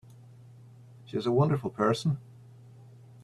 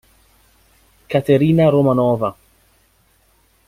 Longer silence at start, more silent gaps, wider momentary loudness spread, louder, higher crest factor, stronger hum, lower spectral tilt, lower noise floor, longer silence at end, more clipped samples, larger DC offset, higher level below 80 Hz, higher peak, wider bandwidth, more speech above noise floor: about the same, 1.05 s vs 1.1 s; neither; about the same, 10 LU vs 9 LU; second, -29 LUFS vs -16 LUFS; about the same, 20 dB vs 16 dB; neither; second, -7.5 dB/octave vs -9 dB/octave; second, -52 dBFS vs -58 dBFS; second, 0.45 s vs 1.35 s; neither; neither; second, -64 dBFS vs -50 dBFS; second, -12 dBFS vs -2 dBFS; second, 12 kHz vs 15.5 kHz; second, 25 dB vs 43 dB